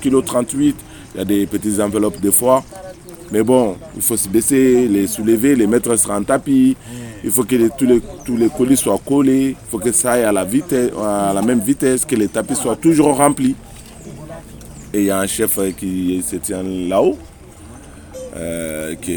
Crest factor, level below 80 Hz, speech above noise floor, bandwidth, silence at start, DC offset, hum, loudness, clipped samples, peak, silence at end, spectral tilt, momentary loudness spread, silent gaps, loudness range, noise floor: 16 dB; -44 dBFS; 22 dB; 19 kHz; 0 s; under 0.1%; none; -16 LUFS; under 0.1%; 0 dBFS; 0 s; -4.5 dB/octave; 17 LU; none; 5 LU; -37 dBFS